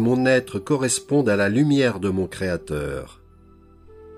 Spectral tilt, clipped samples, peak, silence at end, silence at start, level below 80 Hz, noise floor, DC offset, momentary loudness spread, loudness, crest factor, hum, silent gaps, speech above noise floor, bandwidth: -5.5 dB/octave; under 0.1%; -6 dBFS; 0 s; 0 s; -48 dBFS; -50 dBFS; under 0.1%; 10 LU; -21 LUFS; 16 dB; none; none; 29 dB; 15.5 kHz